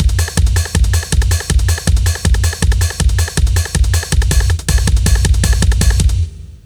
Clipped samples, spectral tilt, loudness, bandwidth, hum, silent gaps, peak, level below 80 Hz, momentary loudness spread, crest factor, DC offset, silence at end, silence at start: under 0.1%; -4 dB/octave; -14 LUFS; over 20 kHz; none; none; 0 dBFS; -14 dBFS; 2 LU; 12 dB; under 0.1%; 0.1 s; 0 s